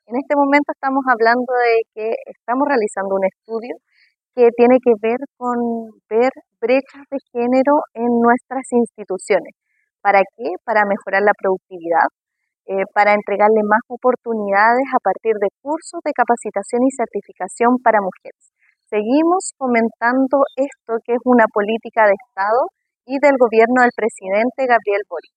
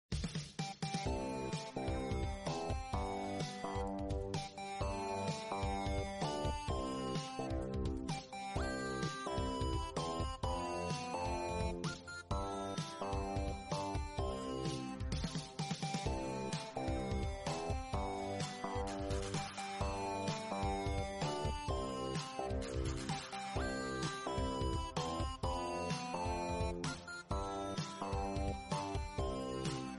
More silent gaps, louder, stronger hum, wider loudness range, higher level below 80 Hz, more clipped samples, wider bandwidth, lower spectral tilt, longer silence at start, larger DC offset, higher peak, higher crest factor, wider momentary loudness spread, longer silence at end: neither; first, -17 LUFS vs -41 LUFS; neither; about the same, 3 LU vs 1 LU; second, -72 dBFS vs -48 dBFS; neither; second, 9.8 kHz vs 11.5 kHz; about the same, -5 dB/octave vs -5 dB/octave; about the same, 0.1 s vs 0.1 s; neither; first, 0 dBFS vs -26 dBFS; about the same, 16 dB vs 14 dB; first, 11 LU vs 3 LU; first, 0.15 s vs 0 s